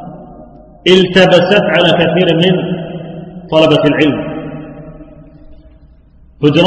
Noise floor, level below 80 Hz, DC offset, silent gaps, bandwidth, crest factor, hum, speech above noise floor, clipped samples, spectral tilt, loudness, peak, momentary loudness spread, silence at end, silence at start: -42 dBFS; -42 dBFS; under 0.1%; none; 9.4 kHz; 12 dB; none; 33 dB; 0.4%; -6.5 dB/octave; -10 LUFS; 0 dBFS; 20 LU; 0 s; 0 s